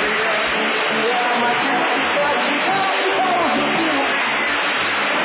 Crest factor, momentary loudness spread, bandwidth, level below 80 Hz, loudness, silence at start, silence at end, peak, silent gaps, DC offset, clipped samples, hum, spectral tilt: 10 dB; 1 LU; 4 kHz; -56 dBFS; -17 LUFS; 0 s; 0 s; -8 dBFS; none; under 0.1%; under 0.1%; none; -7 dB/octave